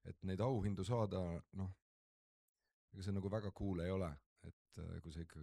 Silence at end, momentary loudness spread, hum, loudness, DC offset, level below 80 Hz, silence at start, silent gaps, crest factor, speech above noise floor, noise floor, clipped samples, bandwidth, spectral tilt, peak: 0 s; 17 LU; none; -44 LUFS; under 0.1%; -62 dBFS; 0.05 s; 1.82-2.55 s, 2.74-2.88 s, 4.26-4.36 s, 4.53-4.65 s; 18 dB; over 48 dB; under -90 dBFS; under 0.1%; 11.5 kHz; -8 dB/octave; -26 dBFS